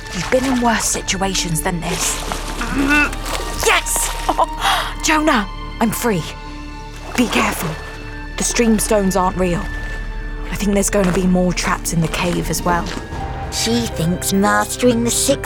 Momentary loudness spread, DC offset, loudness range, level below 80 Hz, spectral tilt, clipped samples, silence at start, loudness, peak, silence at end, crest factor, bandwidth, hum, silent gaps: 12 LU; under 0.1%; 2 LU; -28 dBFS; -3.5 dB/octave; under 0.1%; 0 s; -17 LUFS; -4 dBFS; 0 s; 14 dB; over 20 kHz; none; none